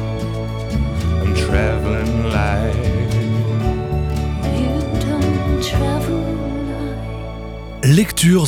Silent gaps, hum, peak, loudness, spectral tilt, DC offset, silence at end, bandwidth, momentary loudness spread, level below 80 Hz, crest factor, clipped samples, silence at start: none; none; -2 dBFS; -19 LUFS; -6 dB/octave; under 0.1%; 0 s; 16.5 kHz; 10 LU; -26 dBFS; 16 dB; under 0.1%; 0 s